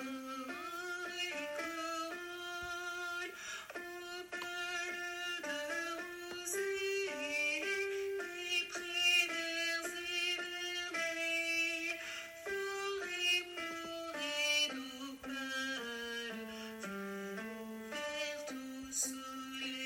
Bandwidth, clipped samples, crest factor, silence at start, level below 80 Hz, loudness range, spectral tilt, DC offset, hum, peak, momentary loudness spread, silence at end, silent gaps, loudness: 16.5 kHz; under 0.1%; 22 dB; 0 s; -76 dBFS; 7 LU; -1 dB/octave; under 0.1%; none; -18 dBFS; 12 LU; 0 s; none; -38 LUFS